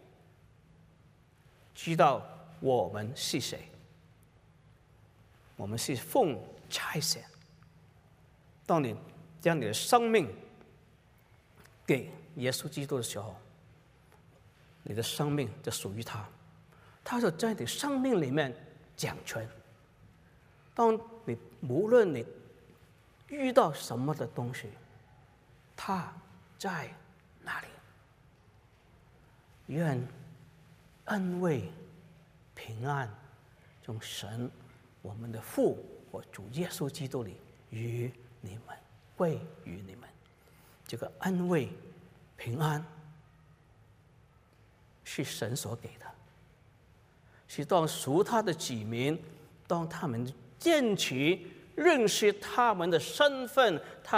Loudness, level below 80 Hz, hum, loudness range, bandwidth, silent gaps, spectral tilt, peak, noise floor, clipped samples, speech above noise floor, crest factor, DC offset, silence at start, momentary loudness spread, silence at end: -32 LUFS; -68 dBFS; none; 10 LU; 16 kHz; none; -5 dB/octave; -10 dBFS; -62 dBFS; under 0.1%; 31 dB; 24 dB; under 0.1%; 1.75 s; 22 LU; 0 s